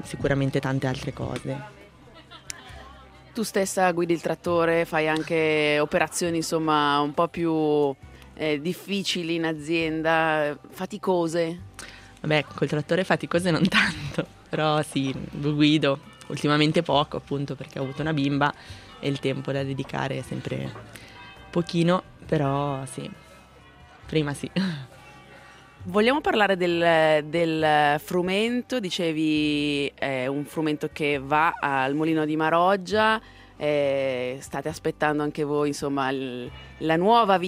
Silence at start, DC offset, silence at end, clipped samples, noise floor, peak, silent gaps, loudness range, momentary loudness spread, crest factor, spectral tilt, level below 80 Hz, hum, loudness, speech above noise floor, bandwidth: 0 s; under 0.1%; 0 s; under 0.1%; -50 dBFS; -6 dBFS; none; 6 LU; 13 LU; 20 dB; -5.5 dB/octave; -54 dBFS; none; -25 LUFS; 26 dB; 16 kHz